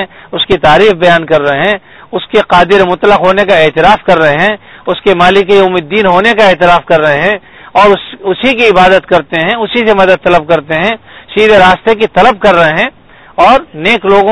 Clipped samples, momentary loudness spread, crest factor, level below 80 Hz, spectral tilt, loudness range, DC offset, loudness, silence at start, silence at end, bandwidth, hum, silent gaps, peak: 3%; 8 LU; 8 dB; -34 dBFS; -5.5 dB/octave; 1 LU; 2%; -7 LUFS; 0 s; 0 s; 11 kHz; none; none; 0 dBFS